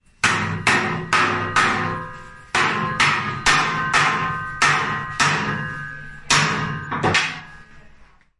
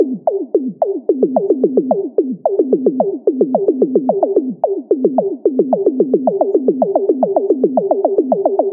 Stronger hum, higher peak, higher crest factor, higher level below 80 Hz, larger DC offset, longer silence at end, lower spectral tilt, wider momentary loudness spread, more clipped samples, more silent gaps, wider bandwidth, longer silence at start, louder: neither; about the same, -2 dBFS vs 0 dBFS; about the same, 18 dB vs 14 dB; first, -48 dBFS vs -66 dBFS; neither; first, 0.35 s vs 0 s; second, -3 dB/octave vs -14 dB/octave; first, 11 LU vs 3 LU; neither; neither; first, 11.5 kHz vs 1.6 kHz; first, 0.25 s vs 0 s; second, -19 LUFS vs -15 LUFS